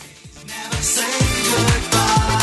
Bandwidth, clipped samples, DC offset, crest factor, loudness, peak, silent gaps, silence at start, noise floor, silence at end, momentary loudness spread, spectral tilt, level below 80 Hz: 12.5 kHz; under 0.1%; under 0.1%; 16 dB; -17 LUFS; -2 dBFS; none; 0 s; -39 dBFS; 0 s; 11 LU; -3 dB/octave; -30 dBFS